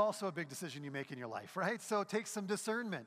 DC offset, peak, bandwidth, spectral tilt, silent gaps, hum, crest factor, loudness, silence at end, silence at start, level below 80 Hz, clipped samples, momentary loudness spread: under 0.1%; -20 dBFS; 15.5 kHz; -4.5 dB/octave; none; none; 18 dB; -40 LUFS; 0 s; 0 s; -90 dBFS; under 0.1%; 8 LU